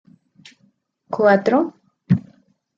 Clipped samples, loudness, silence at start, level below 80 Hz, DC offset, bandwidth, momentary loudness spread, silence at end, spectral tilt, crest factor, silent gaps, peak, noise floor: under 0.1%; -19 LUFS; 1.1 s; -64 dBFS; under 0.1%; 7.6 kHz; 11 LU; 0.6 s; -8.5 dB/octave; 20 dB; none; -2 dBFS; -62 dBFS